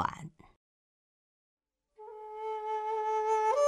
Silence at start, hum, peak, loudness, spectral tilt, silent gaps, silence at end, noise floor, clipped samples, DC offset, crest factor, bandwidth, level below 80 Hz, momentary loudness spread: 0 s; none; -14 dBFS; -33 LUFS; -4 dB/octave; 0.56-1.57 s; 0 s; -55 dBFS; under 0.1%; under 0.1%; 20 dB; 11.5 kHz; -70 dBFS; 21 LU